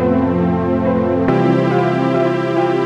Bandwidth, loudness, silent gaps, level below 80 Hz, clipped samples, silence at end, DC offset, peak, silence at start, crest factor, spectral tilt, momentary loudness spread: 8 kHz; -15 LUFS; none; -42 dBFS; under 0.1%; 0 s; under 0.1%; -2 dBFS; 0 s; 12 dB; -8.5 dB/octave; 2 LU